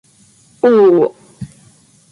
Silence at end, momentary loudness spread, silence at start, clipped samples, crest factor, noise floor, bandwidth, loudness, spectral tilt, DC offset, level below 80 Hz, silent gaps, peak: 0.65 s; 24 LU; 0.65 s; under 0.1%; 14 dB; -49 dBFS; 11.5 kHz; -12 LUFS; -7.5 dB/octave; under 0.1%; -54 dBFS; none; -2 dBFS